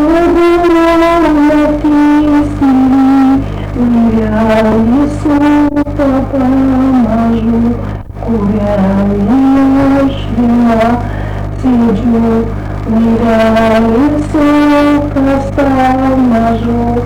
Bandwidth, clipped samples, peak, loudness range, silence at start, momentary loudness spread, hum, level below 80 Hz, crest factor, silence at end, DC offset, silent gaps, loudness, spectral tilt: 11.5 kHz; under 0.1%; -4 dBFS; 3 LU; 0 s; 6 LU; 50 Hz at -25 dBFS; -24 dBFS; 4 dB; 0 s; under 0.1%; none; -10 LUFS; -8 dB/octave